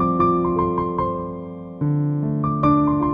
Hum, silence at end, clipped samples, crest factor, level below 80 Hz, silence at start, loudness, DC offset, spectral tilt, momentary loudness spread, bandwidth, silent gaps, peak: none; 0 s; under 0.1%; 16 dB; -42 dBFS; 0 s; -21 LUFS; under 0.1%; -11.5 dB/octave; 11 LU; 5.2 kHz; none; -4 dBFS